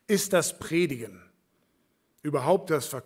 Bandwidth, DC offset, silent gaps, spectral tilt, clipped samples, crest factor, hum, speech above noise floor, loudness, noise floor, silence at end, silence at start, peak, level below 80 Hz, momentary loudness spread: 16.5 kHz; under 0.1%; none; -4.5 dB/octave; under 0.1%; 20 dB; none; 45 dB; -27 LUFS; -71 dBFS; 0.05 s; 0.1 s; -10 dBFS; -68 dBFS; 14 LU